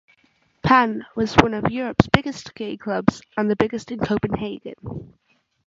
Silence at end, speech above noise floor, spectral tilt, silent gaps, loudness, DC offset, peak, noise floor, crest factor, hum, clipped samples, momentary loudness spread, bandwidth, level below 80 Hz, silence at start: 0.6 s; 41 dB; -6.5 dB/octave; none; -21 LUFS; under 0.1%; 0 dBFS; -62 dBFS; 22 dB; none; under 0.1%; 16 LU; 7.8 kHz; -42 dBFS; 0.65 s